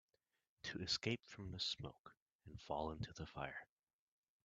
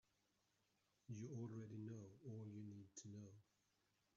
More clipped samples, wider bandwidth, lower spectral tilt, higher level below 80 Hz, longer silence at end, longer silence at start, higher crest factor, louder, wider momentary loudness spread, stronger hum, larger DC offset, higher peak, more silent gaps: neither; first, 8.8 kHz vs 7.4 kHz; second, -4 dB/octave vs -9 dB/octave; first, -68 dBFS vs under -90 dBFS; about the same, 0.8 s vs 0.75 s; second, 0.65 s vs 1.1 s; first, 24 dB vs 16 dB; first, -46 LUFS vs -56 LUFS; first, 18 LU vs 6 LU; neither; neither; first, -26 dBFS vs -42 dBFS; first, 1.99-2.04 s, 2.17-2.26 s, 2.32-2.39 s vs none